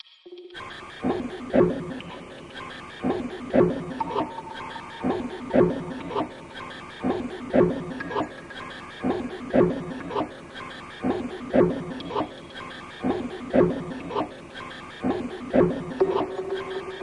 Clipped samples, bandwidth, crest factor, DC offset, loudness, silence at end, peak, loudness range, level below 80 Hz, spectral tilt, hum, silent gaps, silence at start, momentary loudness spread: under 0.1%; 11 kHz; 22 dB; under 0.1%; -27 LUFS; 0 s; -4 dBFS; 2 LU; -52 dBFS; -7.5 dB/octave; none; none; 0.25 s; 16 LU